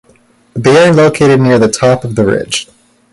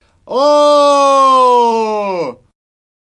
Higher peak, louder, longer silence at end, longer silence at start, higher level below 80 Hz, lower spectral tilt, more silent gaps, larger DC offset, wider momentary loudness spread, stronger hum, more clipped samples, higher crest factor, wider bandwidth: about the same, 0 dBFS vs 0 dBFS; about the same, -9 LUFS vs -10 LUFS; second, 0.5 s vs 0.7 s; first, 0.55 s vs 0.3 s; first, -42 dBFS vs -58 dBFS; first, -5.5 dB/octave vs -3.5 dB/octave; neither; neither; about the same, 10 LU vs 12 LU; neither; neither; about the same, 10 dB vs 10 dB; about the same, 11.5 kHz vs 11.5 kHz